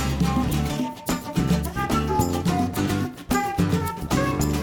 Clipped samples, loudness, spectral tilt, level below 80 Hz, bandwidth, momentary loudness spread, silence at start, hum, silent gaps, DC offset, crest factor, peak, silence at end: under 0.1%; -24 LUFS; -5.5 dB/octave; -34 dBFS; 19 kHz; 4 LU; 0 s; none; none; under 0.1%; 16 dB; -8 dBFS; 0 s